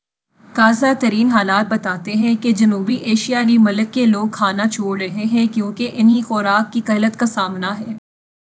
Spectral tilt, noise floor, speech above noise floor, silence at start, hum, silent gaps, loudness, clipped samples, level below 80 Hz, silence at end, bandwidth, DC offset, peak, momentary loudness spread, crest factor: -5 dB/octave; -51 dBFS; 35 dB; 0.55 s; none; none; -16 LUFS; under 0.1%; -66 dBFS; 0.6 s; 8 kHz; under 0.1%; 0 dBFS; 8 LU; 16 dB